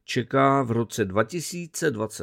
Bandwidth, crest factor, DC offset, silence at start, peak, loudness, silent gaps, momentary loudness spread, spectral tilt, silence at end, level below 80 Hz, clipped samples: 16.5 kHz; 18 dB; under 0.1%; 0.1 s; -6 dBFS; -24 LUFS; none; 8 LU; -5 dB/octave; 0 s; -62 dBFS; under 0.1%